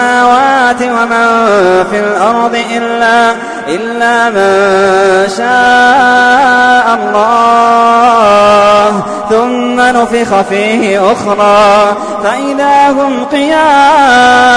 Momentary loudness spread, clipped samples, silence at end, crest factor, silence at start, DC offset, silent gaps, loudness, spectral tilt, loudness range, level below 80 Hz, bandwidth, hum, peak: 6 LU; 0.2%; 0 s; 8 dB; 0 s; under 0.1%; none; -7 LUFS; -3.5 dB/octave; 3 LU; -44 dBFS; 10.5 kHz; none; 0 dBFS